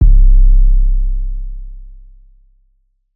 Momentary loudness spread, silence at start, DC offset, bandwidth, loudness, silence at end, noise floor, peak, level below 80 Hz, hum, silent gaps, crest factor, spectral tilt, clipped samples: 20 LU; 0 s; under 0.1%; 0.4 kHz; -15 LUFS; 1.35 s; -58 dBFS; 0 dBFS; -10 dBFS; none; none; 10 dB; -13.5 dB/octave; under 0.1%